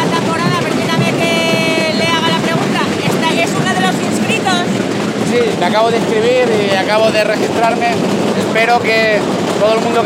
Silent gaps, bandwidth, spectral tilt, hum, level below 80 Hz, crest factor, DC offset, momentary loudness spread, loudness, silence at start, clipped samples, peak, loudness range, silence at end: none; 17 kHz; -4.5 dB/octave; none; -54 dBFS; 12 dB; under 0.1%; 3 LU; -13 LUFS; 0 s; under 0.1%; 0 dBFS; 1 LU; 0 s